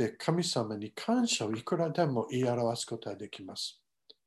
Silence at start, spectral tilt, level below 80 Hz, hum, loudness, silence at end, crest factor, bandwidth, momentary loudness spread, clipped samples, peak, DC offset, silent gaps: 0 s; -4.5 dB/octave; -74 dBFS; none; -32 LUFS; 0.55 s; 18 dB; 12.5 kHz; 10 LU; under 0.1%; -14 dBFS; under 0.1%; none